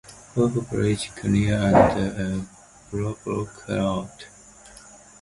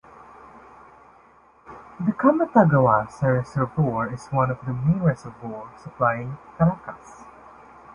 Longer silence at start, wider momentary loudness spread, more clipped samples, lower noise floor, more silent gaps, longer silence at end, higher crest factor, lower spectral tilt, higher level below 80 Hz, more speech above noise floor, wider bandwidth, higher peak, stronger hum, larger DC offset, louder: second, 0.1 s vs 0.55 s; first, 21 LU vs 18 LU; neither; second, -48 dBFS vs -54 dBFS; neither; first, 0.5 s vs 0.05 s; about the same, 22 dB vs 22 dB; second, -6.5 dB/octave vs -9.5 dB/octave; first, -44 dBFS vs -52 dBFS; second, 25 dB vs 32 dB; first, 11.5 kHz vs 10 kHz; about the same, -2 dBFS vs -2 dBFS; neither; neither; about the same, -24 LUFS vs -22 LUFS